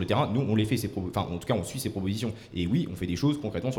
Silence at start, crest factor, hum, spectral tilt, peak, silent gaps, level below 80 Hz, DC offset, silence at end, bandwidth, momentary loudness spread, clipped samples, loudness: 0 s; 16 dB; none; -6.5 dB/octave; -12 dBFS; none; -52 dBFS; under 0.1%; 0 s; 17.5 kHz; 6 LU; under 0.1%; -29 LUFS